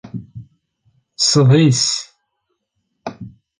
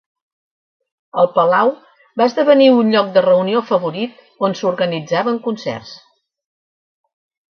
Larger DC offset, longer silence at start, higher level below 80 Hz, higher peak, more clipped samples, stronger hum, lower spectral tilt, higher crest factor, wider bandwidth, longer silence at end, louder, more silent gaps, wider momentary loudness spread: neither; second, 0.05 s vs 1.15 s; first, -56 dBFS vs -66 dBFS; about the same, -2 dBFS vs 0 dBFS; neither; neither; second, -4.5 dB/octave vs -6 dB/octave; about the same, 16 dB vs 16 dB; first, 10 kHz vs 6.6 kHz; second, 0.3 s vs 1.6 s; about the same, -14 LUFS vs -15 LUFS; neither; first, 22 LU vs 15 LU